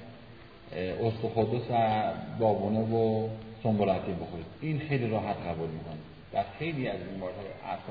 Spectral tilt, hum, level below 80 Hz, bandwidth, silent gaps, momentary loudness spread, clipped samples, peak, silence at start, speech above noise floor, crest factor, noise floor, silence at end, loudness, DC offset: -10.5 dB/octave; none; -58 dBFS; 5 kHz; none; 13 LU; under 0.1%; -14 dBFS; 0 s; 20 dB; 18 dB; -50 dBFS; 0 s; -31 LUFS; under 0.1%